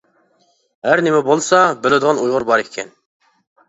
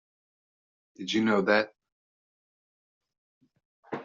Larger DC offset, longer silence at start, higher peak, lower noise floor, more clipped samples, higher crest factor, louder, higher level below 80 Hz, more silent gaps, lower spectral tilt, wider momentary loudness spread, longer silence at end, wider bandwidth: neither; second, 0.85 s vs 1 s; first, 0 dBFS vs -10 dBFS; second, -60 dBFS vs under -90 dBFS; neither; second, 16 dB vs 22 dB; first, -15 LUFS vs -26 LUFS; first, -60 dBFS vs -74 dBFS; second, none vs 1.92-3.01 s, 3.18-3.41 s, 3.65-3.83 s; about the same, -4 dB/octave vs -3 dB/octave; second, 14 LU vs 17 LU; first, 0.8 s vs 0 s; about the same, 8.2 kHz vs 7.6 kHz